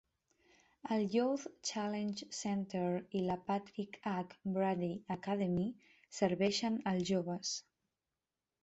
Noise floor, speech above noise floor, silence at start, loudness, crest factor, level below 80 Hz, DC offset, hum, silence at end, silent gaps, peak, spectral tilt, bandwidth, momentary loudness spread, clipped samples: under -90 dBFS; over 53 dB; 0.85 s; -38 LUFS; 20 dB; -72 dBFS; under 0.1%; none; 1.05 s; none; -20 dBFS; -5 dB/octave; 8.2 kHz; 8 LU; under 0.1%